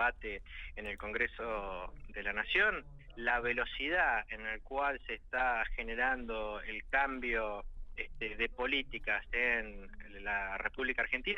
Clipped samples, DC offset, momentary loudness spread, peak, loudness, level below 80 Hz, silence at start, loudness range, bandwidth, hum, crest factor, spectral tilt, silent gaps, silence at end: under 0.1%; under 0.1%; 13 LU; -16 dBFS; -35 LUFS; -48 dBFS; 0 s; 2 LU; 6.8 kHz; none; 20 dB; -5 dB/octave; none; 0 s